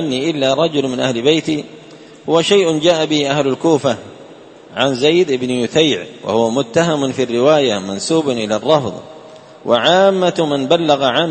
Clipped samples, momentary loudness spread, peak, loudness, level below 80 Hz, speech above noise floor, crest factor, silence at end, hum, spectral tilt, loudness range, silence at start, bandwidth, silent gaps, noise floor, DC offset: under 0.1%; 8 LU; 0 dBFS; -15 LUFS; -56 dBFS; 24 dB; 16 dB; 0 s; none; -4.5 dB/octave; 1 LU; 0 s; 8.8 kHz; none; -39 dBFS; under 0.1%